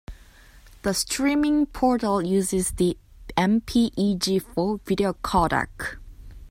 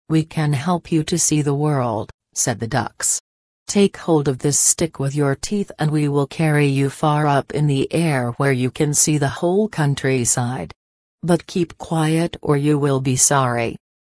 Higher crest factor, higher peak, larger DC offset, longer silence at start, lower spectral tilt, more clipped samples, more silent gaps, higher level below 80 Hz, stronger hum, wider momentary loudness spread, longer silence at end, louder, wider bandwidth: about the same, 18 dB vs 18 dB; second, -6 dBFS vs 0 dBFS; neither; about the same, 0.1 s vs 0.1 s; about the same, -4.5 dB/octave vs -4.5 dB/octave; neither; second, none vs 2.14-2.18 s, 3.20-3.66 s, 10.76-11.18 s; first, -42 dBFS vs -50 dBFS; neither; about the same, 9 LU vs 8 LU; second, 0 s vs 0.3 s; second, -24 LUFS vs -19 LUFS; first, 16 kHz vs 11 kHz